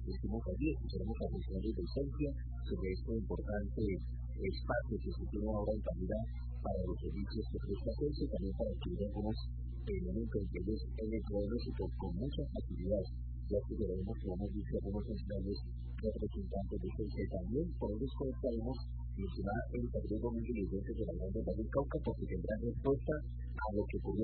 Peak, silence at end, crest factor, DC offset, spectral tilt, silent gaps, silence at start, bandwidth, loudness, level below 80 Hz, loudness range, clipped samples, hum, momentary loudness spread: -20 dBFS; 0 s; 18 dB; under 0.1%; -8 dB/octave; none; 0 s; 4.5 kHz; -40 LUFS; -42 dBFS; 2 LU; under 0.1%; none; 4 LU